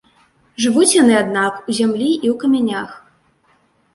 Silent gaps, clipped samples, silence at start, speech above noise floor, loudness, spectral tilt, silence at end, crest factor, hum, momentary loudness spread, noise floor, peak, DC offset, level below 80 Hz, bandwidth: none; under 0.1%; 0.6 s; 43 dB; -15 LUFS; -3.5 dB/octave; 0.95 s; 18 dB; none; 12 LU; -58 dBFS; 0 dBFS; under 0.1%; -60 dBFS; 11.5 kHz